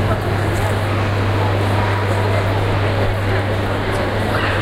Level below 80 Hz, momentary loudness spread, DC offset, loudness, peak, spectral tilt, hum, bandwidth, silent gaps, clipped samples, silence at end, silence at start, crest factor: -30 dBFS; 2 LU; under 0.1%; -18 LUFS; -4 dBFS; -6.5 dB/octave; none; 14 kHz; none; under 0.1%; 0 s; 0 s; 12 dB